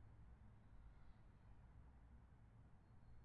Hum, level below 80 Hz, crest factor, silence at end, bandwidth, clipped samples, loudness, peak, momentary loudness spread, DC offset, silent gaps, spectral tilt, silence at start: none; -68 dBFS; 12 dB; 0 s; 4.3 kHz; under 0.1%; -68 LUFS; -52 dBFS; 2 LU; under 0.1%; none; -7.5 dB/octave; 0 s